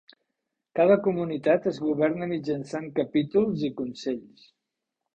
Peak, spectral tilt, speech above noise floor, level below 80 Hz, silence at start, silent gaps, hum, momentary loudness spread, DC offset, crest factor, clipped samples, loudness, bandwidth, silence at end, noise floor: -8 dBFS; -7.5 dB/octave; 59 dB; -64 dBFS; 0.75 s; none; none; 11 LU; under 0.1%; 18 dB; under 0.1%; -26 LUFS; 9 kHz; 0.95 s; -84 dBFS